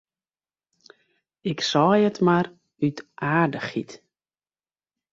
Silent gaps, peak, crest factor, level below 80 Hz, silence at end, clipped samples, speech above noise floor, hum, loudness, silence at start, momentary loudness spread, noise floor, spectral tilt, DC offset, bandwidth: none; -6 dBFS; 20 dB; -66 dBFS; 1.15 s; under 0.1%; over 68 dB; none; -23 LUFS; 1.45 s; 13 LU; under -90 dBFS; -6 dB/octave; under 0.1%; 7.6 kHz